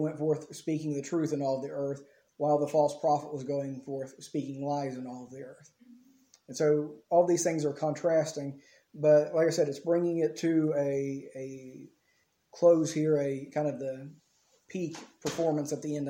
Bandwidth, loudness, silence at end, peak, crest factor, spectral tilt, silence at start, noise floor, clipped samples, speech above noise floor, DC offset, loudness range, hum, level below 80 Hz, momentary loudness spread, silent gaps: 16.5 kHz; -30 LUFS; 0 s; -12 dBFS; 18 dB; -6 dB/octave; 0 s; -73 dBFS; under 0.1%; 43 dB; under 0.1%; 6 LU; none; -76 dBFS; 17 LU; none